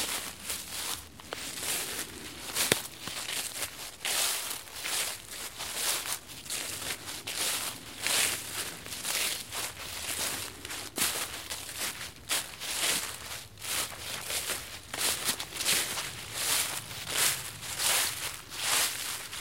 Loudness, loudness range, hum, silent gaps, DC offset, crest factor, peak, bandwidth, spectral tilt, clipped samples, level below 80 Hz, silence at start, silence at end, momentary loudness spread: -31 LUFS; 4 LU; none; none; 0.1%; 32 dB; -2 dBFS; 16.5 kHz; 0 dB/octave; under 0.1%; -60 dBFS; 0 s; 0 s; 10 LU